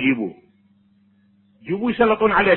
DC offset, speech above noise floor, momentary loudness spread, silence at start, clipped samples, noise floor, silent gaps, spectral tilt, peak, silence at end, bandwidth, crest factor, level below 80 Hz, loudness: under 0.1%; 40 dB; 14 LU; 0 s; under 0.1%; -58 dBFS; none; -10 dB/octave; -2 dBFS; 0 s; 4.2 kHz; 18 dB; -50 dBFS; -20 LUFS